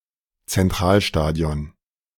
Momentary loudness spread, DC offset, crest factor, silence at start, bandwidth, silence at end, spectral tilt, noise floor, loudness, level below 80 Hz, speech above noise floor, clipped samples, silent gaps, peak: 11 LU; under 0.1%; 18 dB; 0.5 s; 18 kHz; 0.5 s; -5.5 dB/octave; -46 dBFS; -21 LUFS; -34 dBFS; 27 dB; under 0.1%; none; -4 dBFS